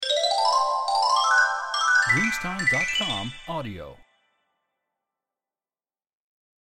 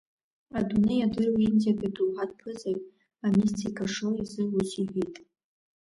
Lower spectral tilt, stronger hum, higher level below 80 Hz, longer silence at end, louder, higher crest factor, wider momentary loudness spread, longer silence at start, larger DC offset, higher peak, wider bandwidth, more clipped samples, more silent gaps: second, -2 dB/octave vs -6.5 dB/octave; neither; about the same, -54 dBFS vs -58 dBFS; first, 2.7 s vs 0.65 s; first, -22 LUFS vs -28 LUFS; about the same, 16 dB vs 16 dB; first, 14 LU vs 11 LU; second, 0 s vs 0.55 s; neither; first, -8 dBFS vs -14 dBFS; first, 16 kHz vs 11.5 kHz; neither; neither